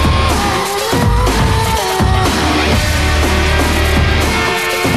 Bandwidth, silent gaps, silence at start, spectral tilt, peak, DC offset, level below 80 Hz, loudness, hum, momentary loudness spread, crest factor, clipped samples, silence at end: 15 kHz; none; 0 s; -4.5 dB/octave; -2 dBFS; 0.7%; -18 dBFS; -13 LUFS; none; 1 LU; 12 dB; under 0.1%; 0 s